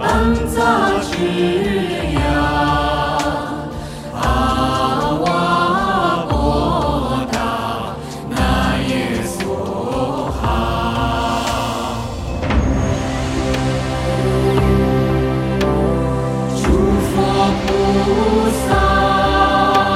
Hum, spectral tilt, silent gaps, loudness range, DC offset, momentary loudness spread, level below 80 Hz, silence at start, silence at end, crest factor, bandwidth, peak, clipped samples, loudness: none; -6 dB/octave; none; 4 LU; under 0.1%; 7 LU; -26 dBFS; 0 s; 0 s; 16 dB; 15.5 kHz; -2 dBFS; under 0.1%; -17 LUFS